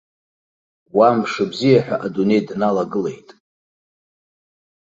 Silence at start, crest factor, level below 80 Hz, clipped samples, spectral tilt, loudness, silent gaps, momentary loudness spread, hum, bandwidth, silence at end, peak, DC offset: 0.95 s; 18 dB; -62 dBFS; under 0.1%; -7 dB/octave; -18 LUFS; none; 8 LU; none; 7.8 kHz; 1.7 s; -2 dBFS; under 0.1%